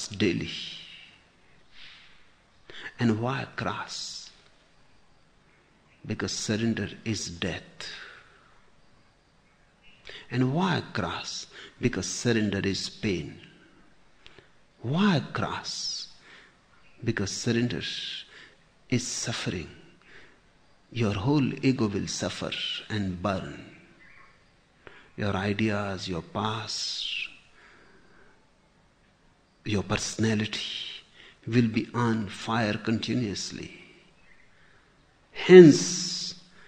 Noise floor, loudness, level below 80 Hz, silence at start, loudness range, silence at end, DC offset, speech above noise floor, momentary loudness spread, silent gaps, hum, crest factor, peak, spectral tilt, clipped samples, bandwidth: -62 dBFS; -27 LUFS; -58 dBFS; 0 s; 6 LU; 0.05 s; under 0.1%; 36 dB; 17 LU; none; none; 28 dB; -2 dBFS; -5 dB/octave; under 0.1%; 9.8 kHz